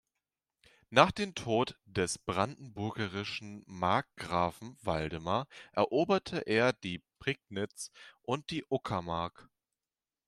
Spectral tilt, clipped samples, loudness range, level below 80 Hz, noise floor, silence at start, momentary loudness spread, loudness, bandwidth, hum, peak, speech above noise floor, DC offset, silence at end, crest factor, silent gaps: -5 dB/octave; under 0.1%; 3 LU; -62 dBFS; under -90 dBFS; 0.9 s; 11 LU; -33 LUFS; 14 kHz; none; -6 dBFS; over 57 dB; under 0.1%; 0.85 s; 28 dB; none